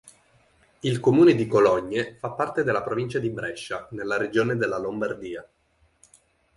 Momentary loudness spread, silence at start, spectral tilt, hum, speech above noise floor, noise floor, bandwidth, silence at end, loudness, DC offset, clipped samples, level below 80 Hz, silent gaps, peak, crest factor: 15 LU; 0.05 s; -6.5 dB/octave; none; 38 dB; -61 dBFS; 11.5 kHz; 1.15 s; -24 LUFS; under 0.1%; under 0.1%; -60 dBFS; none; -6 dBFS; 18 dB